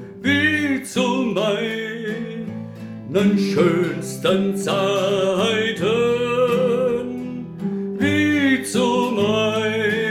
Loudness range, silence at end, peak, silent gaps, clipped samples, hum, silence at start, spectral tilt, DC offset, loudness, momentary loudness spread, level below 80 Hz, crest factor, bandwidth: 2 LU; 0 s; -4 dBFS; none; under 0.1%; none; 0 s; -5 dB/octave; under 0.1%; -20 LUFS; 11 LU; -58 dBFS; 16 dB; 16 kHz